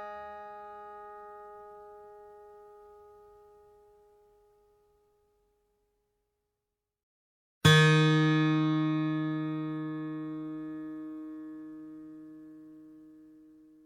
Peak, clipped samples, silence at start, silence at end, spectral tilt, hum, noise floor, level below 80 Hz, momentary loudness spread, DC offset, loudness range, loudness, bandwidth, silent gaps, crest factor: -8 dBFS; under 0.1%; 0 s; 0.85 s; -6 dB/octave; none; -87 dBFS; -66 dBFS; 28 LU; under 0.1%; 22 LU; -28 LUFS; 14.5 kHz; 7.03-7.61 s; 26 dB